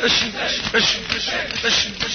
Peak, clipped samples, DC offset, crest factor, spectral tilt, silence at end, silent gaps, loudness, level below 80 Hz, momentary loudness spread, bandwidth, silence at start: -2 dBFS; under 0.1%; under 0.1%; 18 dB; -1.5 dB/octave; 0 s; none; -18 LUFS; -44 dBFS; 4 LU; 6.6 kHz; 0 s